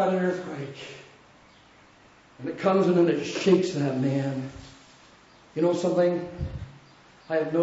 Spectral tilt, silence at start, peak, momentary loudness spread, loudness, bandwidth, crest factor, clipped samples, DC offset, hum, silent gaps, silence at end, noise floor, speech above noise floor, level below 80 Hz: -6.5 dB/octave; 0 s; -8 dBFS; 19 LU; -26 LUFS; 8 kHz; 18 dB; under 0.1%; under 0.1%; none; none; 0 s; -55 dBFS; 30 dB; -52 dBFS